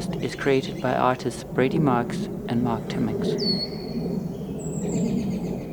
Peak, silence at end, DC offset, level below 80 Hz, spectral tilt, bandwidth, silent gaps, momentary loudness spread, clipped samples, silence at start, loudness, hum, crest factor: -6 dBFS; 0 s; under 0.1%; -48 dBFS; -6 dB/octave; over 20 kHz; none; 8 LU; under 0.1%; 0 s; -25 LUFS; none; 20 dB